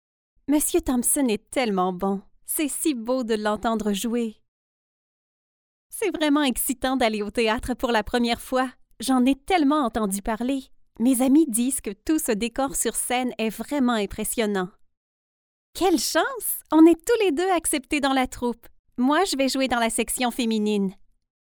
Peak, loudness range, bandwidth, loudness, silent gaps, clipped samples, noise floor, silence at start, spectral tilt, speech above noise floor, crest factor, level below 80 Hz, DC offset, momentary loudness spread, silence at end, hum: -6 dBFS; 5 LU; over 20 kHz; -23 LUFS; 4.48-5.90 s, 14.97-15.73 s, 18.79-18.84 s; under 0.1%; under -90 dBFS; 0.5 s; -3.5 dB/octave; over 67 dB; 18 dB; -48 dBFS; under 0.1%; 8 LU; 0.55 s; none